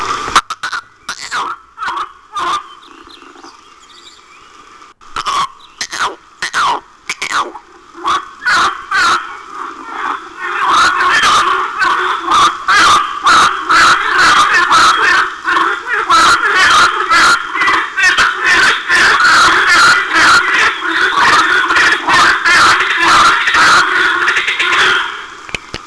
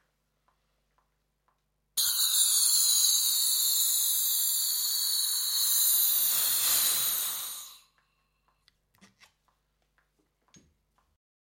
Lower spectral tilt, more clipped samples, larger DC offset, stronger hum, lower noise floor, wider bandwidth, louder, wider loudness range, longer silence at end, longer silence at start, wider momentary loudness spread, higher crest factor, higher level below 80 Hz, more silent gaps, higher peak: first, -0.5 dB/octave vs 4 dB/octave; neither; neither; second, none vs 50 Hz at -80 dBFS; second, -40 dBFS vs -75 dBFS; second, 11 kHz vs 17 kHz; first, -10 LUFS vs -24 LUFS; first, 14 LU vs 7 LU; second, 0 s vs 3.75 s; second, 0 s vs 1.95 s; first, 15 LU vs 7 LU; second, 12 dB vs 20 dB; first, -44 dBFS vs -78 dBFS; neither; first, 0 dBFS vs -10 dBFS